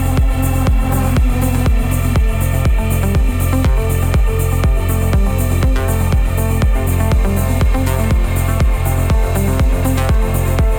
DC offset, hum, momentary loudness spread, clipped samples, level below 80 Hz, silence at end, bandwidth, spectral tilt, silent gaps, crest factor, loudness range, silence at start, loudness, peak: under 0.1%; none; 1 LU; under 0.1%; -16 dBFS; 0 s; 19 kHz; -6.5 dB/octave; none; 8 dB; 0 LU; 0 s; -16 LUFS; -4 dBFS